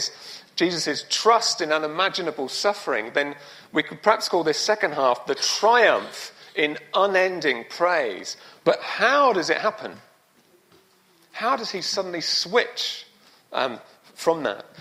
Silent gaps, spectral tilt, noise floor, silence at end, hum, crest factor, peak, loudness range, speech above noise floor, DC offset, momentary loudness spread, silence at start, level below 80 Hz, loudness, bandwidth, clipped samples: none; -2 dB/octave; -59 dBFS; 0 s; none; 20 dB; -4 dBFS; 5 LU; 36 dB; under 0.1%; 13 LU; 0 s; -74 dBFS; -22 LUFS; 16 kHz; under 0.1%